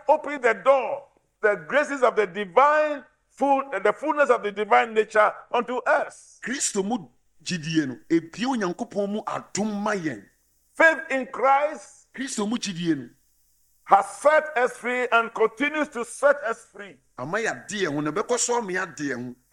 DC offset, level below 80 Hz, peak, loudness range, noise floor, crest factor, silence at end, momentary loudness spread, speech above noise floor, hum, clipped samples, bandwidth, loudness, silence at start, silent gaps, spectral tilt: under 0.1%; -68 dBFS; -2 dBFS; 5 LU; -65 dBFS; 22 dB; 0.2 s; 12 LU; 41 dB; none; under 0.1%; 13 kHz; -24 LUFS; 0.1 s; none; -3.5 dB/octave